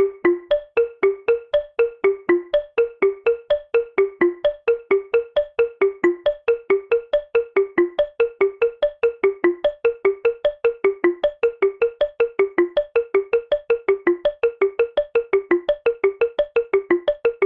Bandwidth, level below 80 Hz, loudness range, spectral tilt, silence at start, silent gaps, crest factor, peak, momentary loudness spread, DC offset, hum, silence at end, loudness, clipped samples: 4.7 kHz; -54 dBFS; 0 LU; -7 dB/octave; 0 s; none; 18 dB; -4 dBFS; 3 LU; under 0.1%; none; 0 s; -21 LUFS; under 0.1%